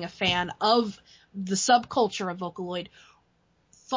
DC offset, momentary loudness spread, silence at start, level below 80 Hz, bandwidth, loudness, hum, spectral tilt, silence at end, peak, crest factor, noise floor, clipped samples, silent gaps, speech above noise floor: under 0.1%; 14 LU; 0 s; -60 dBFS; 7.6 kHz; -26 LUFS; none; -3.5 dB/octave; 0 s; -8 dBFS; 18 dB; -68 dBFS; under 0.1%; none; 41 dB